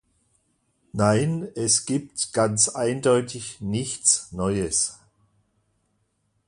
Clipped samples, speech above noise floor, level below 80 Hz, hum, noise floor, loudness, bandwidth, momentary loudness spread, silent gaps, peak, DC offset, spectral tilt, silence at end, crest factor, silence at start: under 0.1%; 48 dB; -52 dBFS; none; -71 dBFS; -23 LUFS; 11.5 kHz; 8 LU; none; -4 dBFS; under 0.1%; -4 dB/octave; 1.55 s; 22 dB; 0.95 s